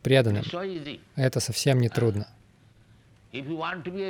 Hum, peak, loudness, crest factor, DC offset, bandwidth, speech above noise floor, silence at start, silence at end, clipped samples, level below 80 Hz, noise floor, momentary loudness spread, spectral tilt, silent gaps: none; -6 dBFS; -27 LUFS; 20 dB; under 0.1%; 17.5 kHz; 31 dB; 0.05 s; 0 s; under 0.1%; -60 dBFS; -57 dBFS; 14 LU; -5.5 dB/octave; none